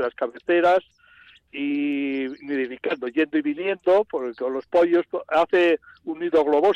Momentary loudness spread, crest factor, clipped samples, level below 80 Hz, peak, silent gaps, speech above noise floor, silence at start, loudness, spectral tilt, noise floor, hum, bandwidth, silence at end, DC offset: 10 LU; 12 dB; under 0.1%; -66 dBFS; -10 dBFS; none; 31 dB; 0 s; -23 LUFS; -6 dB/octave; -53 dBFS; none; 7.8 kHz; 0 s; under 0.1%